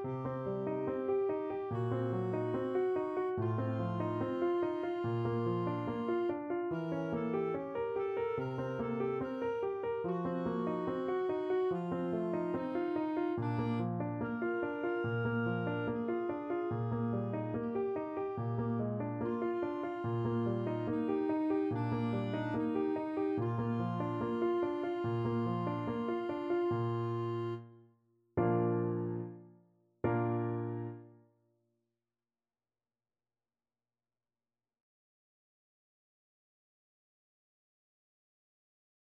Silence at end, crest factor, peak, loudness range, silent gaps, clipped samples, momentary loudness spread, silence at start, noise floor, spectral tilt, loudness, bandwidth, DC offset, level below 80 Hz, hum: 7.9 s; 18 dB; -18 dBFS; 2 LU; none; under 0.1%; 4 LU; 0 s; under -90 dBFS; -10 dB/octave; -36 LUFS; 5.2 kHz; under 0.1%; -68 dBFS; none